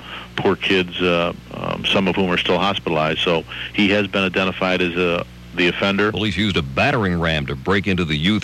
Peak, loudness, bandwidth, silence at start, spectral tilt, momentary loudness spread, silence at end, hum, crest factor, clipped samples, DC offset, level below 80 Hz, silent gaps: -4 dBFS; -19 LUFS; 12.5 kHz; 0 s; -6 dB/octave; 5 LU; 0 s; none; 14 dB; under 0.1%; under 0.1%; -42 dBFS; none